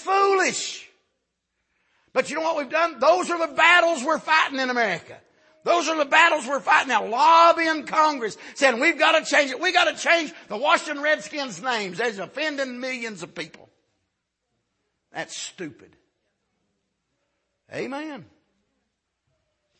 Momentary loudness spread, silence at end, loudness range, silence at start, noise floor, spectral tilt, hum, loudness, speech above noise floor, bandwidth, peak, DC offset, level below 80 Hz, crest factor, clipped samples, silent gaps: 17 LU; 1.55 s; 20 LU; 0 s; -78 dBFS; -2 dB/octave; none; -21 LUFS; 56 dB; 8.8 kHz; -2 dBFS; under 0.1%; -76 dBFS; 20 dB; under 0.1%; none